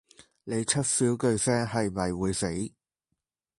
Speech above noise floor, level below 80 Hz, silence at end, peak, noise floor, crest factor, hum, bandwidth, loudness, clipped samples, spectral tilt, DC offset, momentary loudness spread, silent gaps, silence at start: 56 dB; -52 dBFS; 0.9 s; -10 dBFS; -83 dBFS; 18 dB; none; 11.5 kHz; -27 LUFS; under 0.1%; -4.5 dB/octave; under 0.1%; 10 LU; none; 0.45 s